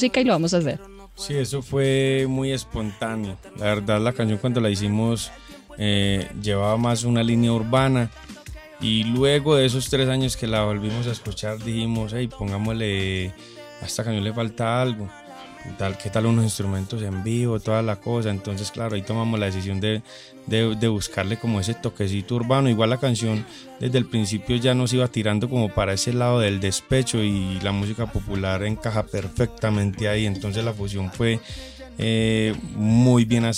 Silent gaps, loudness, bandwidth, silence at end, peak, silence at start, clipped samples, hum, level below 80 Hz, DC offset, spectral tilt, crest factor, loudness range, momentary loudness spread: none; -23 LUFS; 15 kHz; 0 s; -6 dBFS; 0 s; under 0.1%; none; -44 dBFS; under 0.1%; -5.5 dB/octave; 16 dB; 4 LU; 10 LU